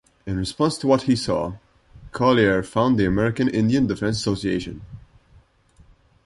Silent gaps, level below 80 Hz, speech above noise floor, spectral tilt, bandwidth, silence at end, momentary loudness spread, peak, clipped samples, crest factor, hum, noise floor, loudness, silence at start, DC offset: none; -44 dBFS; 34 dB; -6 dB/octave; 11.5 kHz; 1.25 s; 11 LU; -4 dBFS; under 0.1%; 18 dB; none; -55 dBFS; -21 LUFS; 0.25 s; under 0.1%